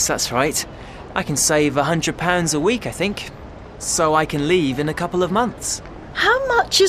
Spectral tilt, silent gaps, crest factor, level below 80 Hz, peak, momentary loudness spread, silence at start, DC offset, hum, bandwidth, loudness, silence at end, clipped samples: -3.5 dB/octave; none; 18 dB; -42 dBFS; -2 dBFS; 13 LU; 0 s; under 0.1%; none; 14 kHz; -19 LUFS; 0 s; under 0.1%